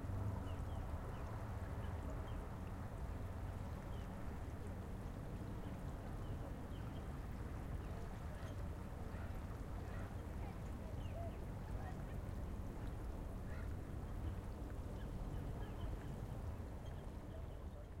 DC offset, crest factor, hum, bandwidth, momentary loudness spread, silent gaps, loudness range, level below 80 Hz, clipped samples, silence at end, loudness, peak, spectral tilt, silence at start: under 0.1%; 12 dB; none; 16 kHz; 3 LU; none; 1 LU; -50 dBFS; under 0.1%; 0 s; -49 LUFS; -34 dBFS; -7.5 dB/octave; 0 s